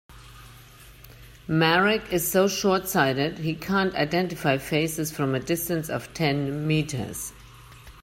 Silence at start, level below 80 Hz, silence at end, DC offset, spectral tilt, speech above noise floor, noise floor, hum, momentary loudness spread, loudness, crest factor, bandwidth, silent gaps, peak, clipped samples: 0.1 s; -52 dBFS; 0 s; under 0.1%; -4.5 dB/octave; 24 dB; -48 dBFS; 50 Hz at -50 dBFS; 9 LU; -25 LUFS; 18 dB; 16.5 kHz; none; -6 dBFS; under 0.1%